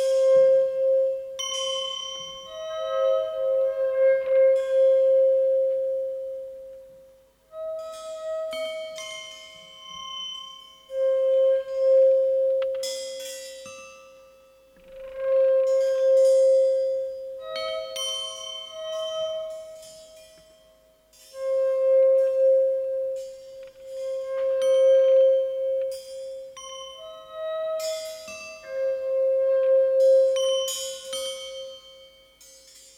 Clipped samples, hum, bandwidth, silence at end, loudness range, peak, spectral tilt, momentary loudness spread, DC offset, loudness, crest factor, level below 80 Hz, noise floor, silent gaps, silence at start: under 0.1%; none; 13.5 kHz; 0.95 s; 11 LU; -12 dBFS; 0 dB/octave; 21 LU; under 0.1%; -23 LUFS; 12 dB; -68 dBFS; -58 dBFS; none; 0 s